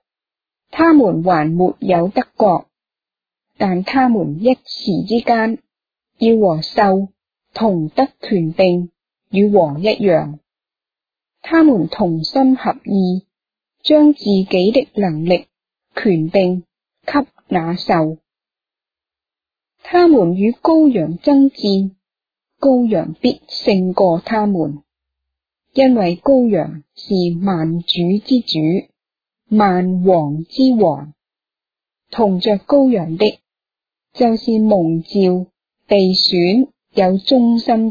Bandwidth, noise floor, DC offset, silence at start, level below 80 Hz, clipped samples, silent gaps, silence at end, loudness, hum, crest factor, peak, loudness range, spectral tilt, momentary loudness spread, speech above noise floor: 5 kHz; -89 dBFS; under 0.1%; 0.75 s; -52 dBFS; under 0.1%; none; 0 s; -15 LUFS; none; 14 dB; 0 dBFS; 3 LU; -8 dB/octave; 9 LU; 76 dB